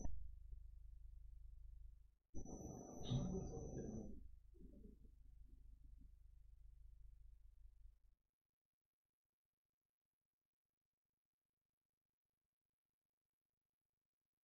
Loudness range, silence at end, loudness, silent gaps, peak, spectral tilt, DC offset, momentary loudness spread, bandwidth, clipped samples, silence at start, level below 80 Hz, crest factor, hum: 17 LU; 6.55 s; -54 LUFS; 2.29-2.33 s; -32 dBFS; -8.5 dB/octave; under 0.1%; 21 LU; 6.4 kHz; under 0.1%; 0 s; -60 dBFS; 24 dB; none